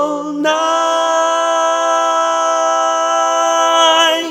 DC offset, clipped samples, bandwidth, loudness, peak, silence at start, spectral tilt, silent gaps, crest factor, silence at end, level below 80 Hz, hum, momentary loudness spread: under 0.1%; under 0.1%; 17.5 kHz; -13 LUFS; 0 dBFS; 0 s; -0.5 dB/octave; none; 12 dB; 0 s; -68 dBFS; none; 4 LU